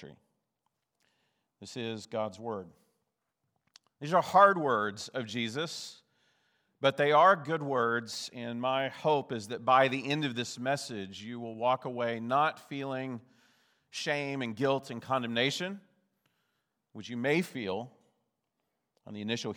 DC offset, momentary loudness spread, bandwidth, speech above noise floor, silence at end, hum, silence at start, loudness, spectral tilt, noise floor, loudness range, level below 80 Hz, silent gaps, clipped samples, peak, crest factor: under 0.1%; 17 LU; 20 kHz; 52 dB; 0 s; none; 0 s; -30 LUFS; -4.5 dB/octave; -83 dBFS; 9 LU; -84 dBFS; none; under 0.1%; -8 dBFS; 26 dB